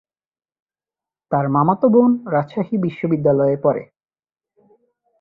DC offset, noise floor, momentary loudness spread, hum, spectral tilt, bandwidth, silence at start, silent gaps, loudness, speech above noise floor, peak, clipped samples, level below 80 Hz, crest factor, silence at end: under 0.1%; under -90 dBFS; 8 LU; none; -11.5 dB/octave; 4.6 kHz; 1.3 s; none; -18 LUFS; over 73 dB; -2 dBFS; under 0.1%; -60 dBFS; 18 dB; 1.35 s